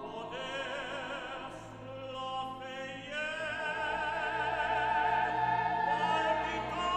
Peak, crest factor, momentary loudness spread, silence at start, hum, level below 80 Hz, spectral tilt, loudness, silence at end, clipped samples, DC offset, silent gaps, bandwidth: -18 dBFS; 16 dB; 12 LU; 0 s; none; -58 dBFS; -4 dB/octave; -34 LUFS; 0 s; under 0.1%; under 0.1%; none; 9.8 kHz